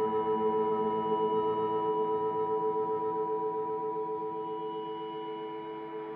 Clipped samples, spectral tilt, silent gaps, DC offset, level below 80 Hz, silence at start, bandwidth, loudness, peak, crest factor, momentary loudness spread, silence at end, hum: under 0.1%; -9.5 dB/octave; none; under 0.1%; -72 dBFS; 0 s; 4 kHz; -32 LUFS; -20 dBFS; 12 dB; 9 LU; 0 s; none